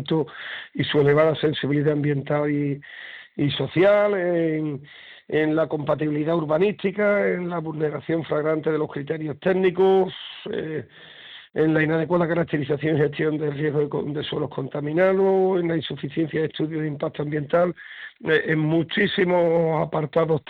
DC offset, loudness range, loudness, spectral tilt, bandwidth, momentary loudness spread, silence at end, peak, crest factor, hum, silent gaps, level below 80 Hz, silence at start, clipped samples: under 0.1%; 2 LU; -23 LUFS; -9 dB/octave; 4.8 kHz; 12 LU; 0.1 s; -6 dBFS; 18 dB; none; none; -60 dBFS; 0 s; under 0.1%